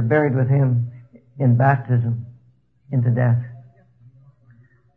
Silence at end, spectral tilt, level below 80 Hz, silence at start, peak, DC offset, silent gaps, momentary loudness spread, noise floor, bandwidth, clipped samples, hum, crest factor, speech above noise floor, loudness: 1.35 s; -12 dB/octave; -60 dBFS; 0 s; -4 dBFS; under 0.1%; none; 13 LU; -57 dBFS; 3.1 kHz; under 0.1%; none; 18 dB; 40 dB; -20 LUFS